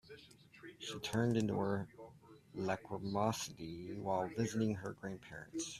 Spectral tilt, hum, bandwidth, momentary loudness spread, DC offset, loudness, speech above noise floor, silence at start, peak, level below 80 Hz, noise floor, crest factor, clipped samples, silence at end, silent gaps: -5.5 dB/octave; none; 14 kHz; 21 LU; under 0.1%; -40 LUFS; 21 dB; 0.05 s; -20 dBFS; -70 dBFS; -60 dBFS; 20 dB; under 0.1%; 0 s; none